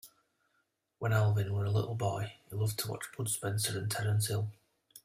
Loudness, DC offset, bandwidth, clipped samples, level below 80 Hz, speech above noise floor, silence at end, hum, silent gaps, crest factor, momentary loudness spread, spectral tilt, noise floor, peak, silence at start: -34 LUFS; under 0.1%; 16 kHz; under 0.1%; -64 dBFS; 46 dB; 0.05 s; none; none; 18 dB; 9 LU; -4.5 dB/octave; -79 dBFS; -16 dBFS; 0.05 s